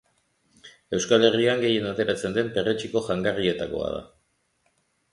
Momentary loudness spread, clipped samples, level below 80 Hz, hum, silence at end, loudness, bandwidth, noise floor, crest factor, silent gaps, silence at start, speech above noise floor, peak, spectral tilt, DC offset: 11 LU; under 0.1%; -56 dBFS; none; 1.05 s; -24 LUFS; 11.5 kHz; -70 dBFS; 22 dB; none; 0.65 s; 46 dB; -4 dBFS; -4.5 dB/octave; under 0.1%